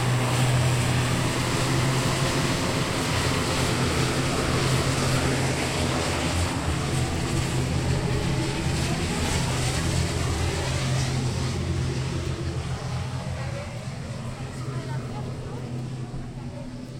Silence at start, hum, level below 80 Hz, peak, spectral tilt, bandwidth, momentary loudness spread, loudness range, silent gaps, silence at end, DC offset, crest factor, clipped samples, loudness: 0 s; none; -38 dBFS; -10 dBFS; -4.5 dB/octave; 16.5 kHz; 10 LU; 8 LU; none; 0 s; under 0.1%; 16 dB; under 0.1%; -26 LUFS